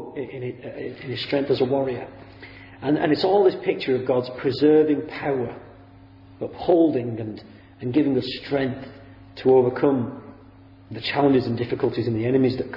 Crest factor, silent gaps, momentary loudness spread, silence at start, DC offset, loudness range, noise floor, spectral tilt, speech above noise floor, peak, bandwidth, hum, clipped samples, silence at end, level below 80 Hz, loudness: 18 dB; none; 18 LU; 0 s; under 0.1%; 3 LU; -48 dBFS; -9 dB/octave; 26 dB; -6 dBFS; 5.8 kHz; none; under 0.1%; 0 s; -56 dBFS; -22 LUFS